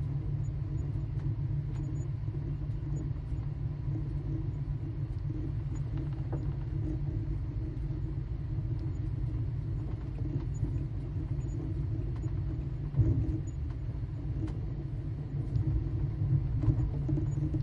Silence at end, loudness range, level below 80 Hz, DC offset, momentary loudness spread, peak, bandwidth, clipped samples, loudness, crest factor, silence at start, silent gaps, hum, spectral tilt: 0 s; 3 LU; -40 dBFS; under 0.1%; 6 LU; -14 dBFS; 7.4 kHz; under 0.1%; -35 LUFS; 18 dB; 0 s; none; none; -10 dB/octave